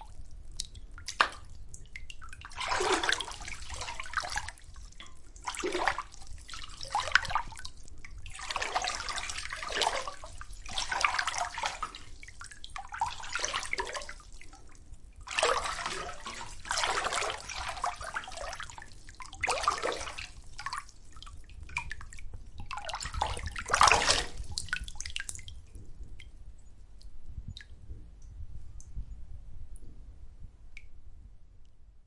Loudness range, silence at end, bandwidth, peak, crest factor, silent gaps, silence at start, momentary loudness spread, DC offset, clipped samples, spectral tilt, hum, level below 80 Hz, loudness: 20 LU; 0.05 s; 11.5 kHz; -2 dBFS; 32 dB; none; 0 s; 23 LU; under 0.1%; under 0.1%; -1.5 dB/octave; none; -48 dBFS; -33 LUFS